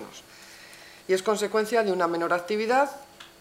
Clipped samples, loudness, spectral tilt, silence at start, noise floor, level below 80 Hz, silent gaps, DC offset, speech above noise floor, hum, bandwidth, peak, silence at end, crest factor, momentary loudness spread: under 0.1%; -25 LUFS; -4 dB/octave; 0 s; -48 dBFS; -70 dBFS; none; under 0.1%; 23 dB; none; 16 kHz; -10 dBFS; 0.15 s; 18 dB; 21 LU